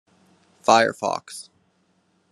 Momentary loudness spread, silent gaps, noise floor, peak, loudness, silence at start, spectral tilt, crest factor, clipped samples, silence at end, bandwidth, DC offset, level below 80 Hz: 21 LU; none; -66 dBFS; -2 dBFS; -21 LUFS; 0.7 s; -3 dB/octave; 24 dB; under 0.1%; 0.9 s; 12.5 kHz; under 0.1%; -78 dBFS